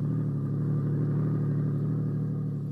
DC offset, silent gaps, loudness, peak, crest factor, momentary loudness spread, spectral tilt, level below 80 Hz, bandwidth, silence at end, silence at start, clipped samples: under 0.1%; none; -29 LUFS; -18 dBFS; 10 dB; 3 LU; -12 dB/octave; -56 dBFS; 2.1 kHz; 0 s; 0 s; under 0.1%